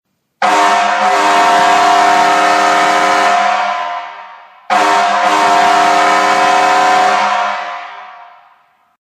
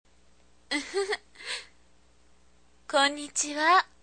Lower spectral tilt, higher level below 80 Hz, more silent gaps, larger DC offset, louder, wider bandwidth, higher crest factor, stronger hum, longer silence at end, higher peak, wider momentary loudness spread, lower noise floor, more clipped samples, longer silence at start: first, -1.5 dB/octave vs 0 dB/octave; first, -60 dBFS vs -66 dBFS; neither; second, under 0.1% vs 0.1%; first, -10 LUFS vs -28 LUFS; first, 15 kHz vs 9.8 kHz; second, 12 dB vs 20 dB; neither; first, 0.8 s vs 0.2 s; first, 0 dBFS vs -10 dBFS; second, 10 LU vs 14 LU; second, -51 dBFS vs -63 dBFS; neither; second, 0.4 s vs 0.7 s